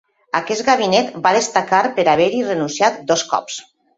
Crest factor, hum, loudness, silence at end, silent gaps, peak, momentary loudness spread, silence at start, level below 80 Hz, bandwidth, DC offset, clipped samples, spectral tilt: 16 dB; none; -17 LUFS; 0.35 s; none; 0 dBFS; 8 LU; 0.35 s; -60 dBFS; 8.2 kHz; under 0.1%; under 0.1%; -3 dB/octave